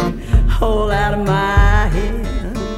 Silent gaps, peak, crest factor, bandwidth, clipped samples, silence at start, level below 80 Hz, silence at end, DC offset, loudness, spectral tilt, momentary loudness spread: none; 0 dBFS; 14 dB; 12 kHz; under 0.1%; 0 s; -18 dBFS; 0 s; under 0.1%; -17 LUFS; -6.5 dB/octave; 9 LU